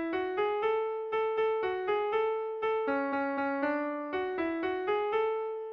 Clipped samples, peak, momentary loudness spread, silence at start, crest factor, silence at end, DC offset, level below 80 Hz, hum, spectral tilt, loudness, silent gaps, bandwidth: under 0.1%; -18 dBFS; 3 LU; 0 s; 12 dB; 0 s; under 0.1%; -68 dBFS; none; -6.5 dB/octave; -31 LUFS; none; 5.4 kHz